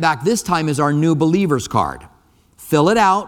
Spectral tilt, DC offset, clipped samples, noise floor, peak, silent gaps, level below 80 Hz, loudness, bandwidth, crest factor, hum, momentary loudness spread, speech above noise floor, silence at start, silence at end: -5.5 dB/octave; under 0.1%; under 0.1%; -50 dBFS; 0 dBFS; none; -46 dBFS; -17 LUFS; 17.5 kHz; 16 dB; none; 7 LU; 34 dB; 0 s; 0 s